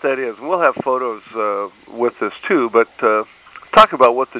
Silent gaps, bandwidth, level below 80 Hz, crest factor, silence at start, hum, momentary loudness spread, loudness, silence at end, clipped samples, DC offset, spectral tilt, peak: none; 4 kHz; -56 dBFS; 16 dB; 0.05 s; none; 13 LU; -16 LUFS; 0 s; under 0.1%; under 0.1%; -8 dB/octave; 0 dBFS